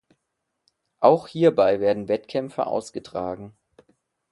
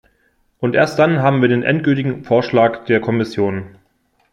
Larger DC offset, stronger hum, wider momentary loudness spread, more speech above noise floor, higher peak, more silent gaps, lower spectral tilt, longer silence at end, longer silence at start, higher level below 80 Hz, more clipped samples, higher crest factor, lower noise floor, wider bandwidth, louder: neither; neither; first, 13 LU vs 6 LU; first, 57 dB vs 46 dB; about the same, -2 dBFS vs -2 dBFS; neither; about the same, -6.5 dB/octave vs -7.5 dB/octave; first, 0.8 s vs 0.65 s; first, 1 s vs 0.6 s; second, -62 dBFS vs -56 dBFS; neither; first, 22 dB vs 14 dB; first, -79 dBFS vs -62 dBFS; about the same, 11.5 kHz vs 12 kHz; second, -23 LUFS vs -16 LUFS